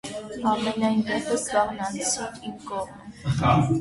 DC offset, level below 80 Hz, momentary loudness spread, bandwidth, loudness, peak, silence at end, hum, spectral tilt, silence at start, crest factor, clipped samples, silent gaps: under 0.1%; -48 dBFS; 13 LU; 11.5 kHz; -25 LUFS; -8 dBFS; 0 s; none; -5 dB/octave; 0.05 s; 18 dB; under 0.1%; none